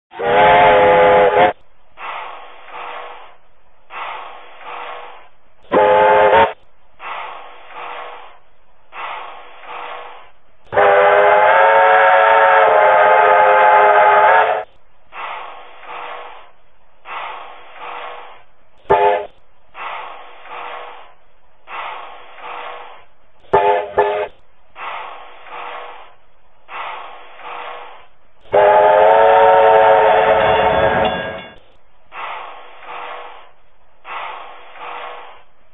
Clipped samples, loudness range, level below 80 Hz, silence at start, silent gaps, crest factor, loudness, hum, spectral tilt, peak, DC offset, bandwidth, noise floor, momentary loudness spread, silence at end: under 0.1%; 21 LU; -48 dBFS; 0.15 s; none; 16 dB; -11 LUFS; none; -6.5 dB/octave; 0 dBFS; 1%; 4 kHz; -54 dBFS; 24 LU; 0.5 s